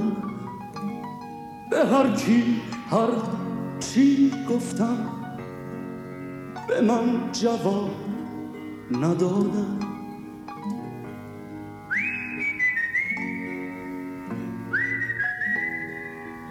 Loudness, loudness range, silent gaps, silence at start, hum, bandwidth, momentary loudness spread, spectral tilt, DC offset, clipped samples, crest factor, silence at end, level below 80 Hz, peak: -26 LUFS; 5 LU; none; 0 s; none; 16 kHz; 16 LU; -6 dB/octave; under 0.1%; under 0.1%; 18 dB; 0 s; -60 dBFS; -8 dBFS